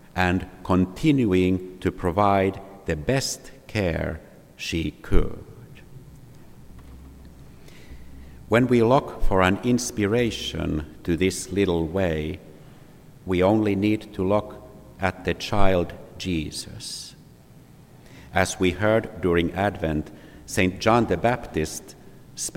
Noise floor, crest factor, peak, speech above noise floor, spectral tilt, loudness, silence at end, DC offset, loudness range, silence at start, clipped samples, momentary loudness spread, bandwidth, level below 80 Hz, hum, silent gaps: -49 dBFS; 22 dB; -2 dBFS; 27 dB; -5.5 dB/octave; -24 LUFS; 0.05 s; under 0.1%; 7 LU; 0.15 s; under 0.1%; 13 LU; 16.5 kHz; -36 dBFS; none; none